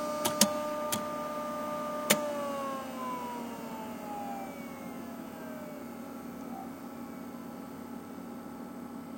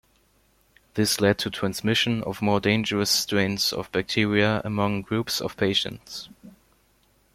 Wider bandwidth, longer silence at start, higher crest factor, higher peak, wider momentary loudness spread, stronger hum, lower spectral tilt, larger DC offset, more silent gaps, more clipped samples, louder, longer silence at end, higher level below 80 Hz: about the same, 16.5 kHz vs 16 kHz; second, 0 s vs 0.95 s; first, 30 dB vs 20 dB; about the same, -6 dBFS vs -4 dBFS; first, 15 LU vs 8 LU; neither; about the same, -3 dB/octave vs -4 dB/octave; neither; neither; neither; second, -36 LUFS vs -24 LUFS; second, 0 s vs 0.85 s; second, -76 dBFS vs -56 dBFS